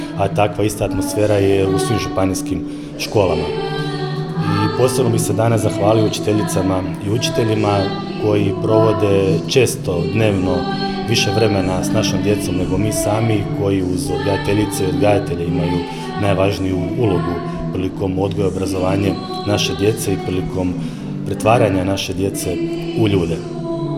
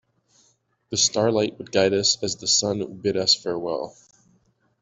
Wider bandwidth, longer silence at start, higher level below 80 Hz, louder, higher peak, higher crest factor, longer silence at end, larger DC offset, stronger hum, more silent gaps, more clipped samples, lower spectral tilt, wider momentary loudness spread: first, 16.5 kHz vs 8.4 kHz; second, 0 s vs 0.9 s; first, -40 dBFS vs -62 dBFS; first, -18 LUFS vs -22 LUFS; first, 0 dBFS vs -6 dBFS; about the same, 16 dB vs 20 dB; second, 0 s vs 0.9 s; neither; neither; neither; neither; first, -6 dB/octave vs -2.5 dB/octave; about the same, 7 LU vs 9 LU